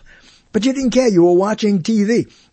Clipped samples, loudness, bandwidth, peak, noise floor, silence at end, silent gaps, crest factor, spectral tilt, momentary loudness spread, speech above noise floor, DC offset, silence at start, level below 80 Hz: under 0.1%; -15 LUFS; 8.6 kHz; -2 dBFS; -46 dBFS; 0.3 s; none; 14 dB; -6 dB/octave; 7 LU; 32 dB; under 0.1%; 0.55 s; -48 dBFS